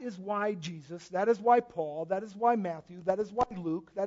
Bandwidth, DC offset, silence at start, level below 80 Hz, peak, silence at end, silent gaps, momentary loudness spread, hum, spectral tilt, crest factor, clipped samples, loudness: 7.8 kHz; under 0.1%; 0 s; -66 dBFS; -12 dBFS; 0 s; none; 11 LU; none; -6.5 dB/octave; 20 dB; under 0.1%; -31 LUFS